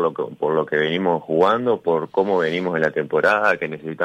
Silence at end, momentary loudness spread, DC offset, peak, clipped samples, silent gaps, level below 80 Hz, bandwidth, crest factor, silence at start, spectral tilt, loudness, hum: 0 s; 5 LU; under 0.1%; -6 dBFS; under 0.1%; none; -66 dBFS; 9.6 kHz; 14 dB; 0 s; -6.5 dB/octave; -20 LUFS; none